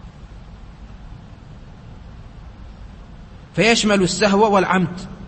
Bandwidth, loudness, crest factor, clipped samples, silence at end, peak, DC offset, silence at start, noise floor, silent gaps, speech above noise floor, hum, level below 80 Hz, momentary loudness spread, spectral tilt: 8.8 kHz; -16 LUFS; 20 dB; under 0.1%; 0 s; -2 dBFS; under 0.1%; 0 s; -39 dBFS; none; 23 dB; none; -40 dBFS; 26 LU; -4.5 dB/octave